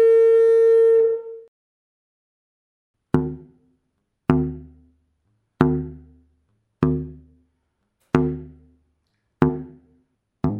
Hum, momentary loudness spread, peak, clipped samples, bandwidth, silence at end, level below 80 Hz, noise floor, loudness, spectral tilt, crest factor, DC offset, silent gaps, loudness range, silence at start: none; 22 LU; -2 dBFS; under 0.1%; 4.8 kHz; 0 s; -44 dBFS; -74 dBFS; -20 LUFS; -9.5 dB/octave; 20 dB; under 0.1%; 1.48-2.94 s; 8 LU; 0 s